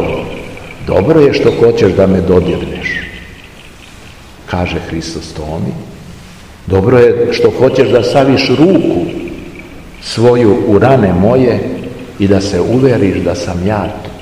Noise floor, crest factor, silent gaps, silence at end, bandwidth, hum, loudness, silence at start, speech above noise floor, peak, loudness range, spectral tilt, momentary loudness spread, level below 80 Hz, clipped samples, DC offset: -34 dBFS; 12 dB; none; 0 s; 12.5 kHz; none; -11 LUFS; 0 s; 24 dB; 0 dBFS; 10 LU; -7 dB/octave; 18 LU; -34 dBFS; 1%; 0.6%